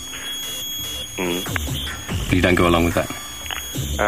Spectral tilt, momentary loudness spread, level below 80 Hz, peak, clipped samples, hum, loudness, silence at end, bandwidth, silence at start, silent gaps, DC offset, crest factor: -4 dB/octave; 11 LU; -34 dBFS; -4 dBFS; under 0.1%; none; -22 LUFS; 0 s; 16 kHz; 0 s; none; 0.6%; 18 dB